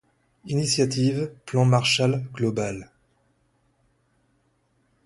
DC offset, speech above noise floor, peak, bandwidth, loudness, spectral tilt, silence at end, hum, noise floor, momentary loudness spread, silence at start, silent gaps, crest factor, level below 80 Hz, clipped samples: under 0.1%; 45 dB; -6 dBFS; 11.5 kHz; -23 LUFS; -5 dB/octave; 2.2 s; none; -68 dBFS; 10 LU; 0.45 s; none; 20 dB; -58 dBFS; under 0.1%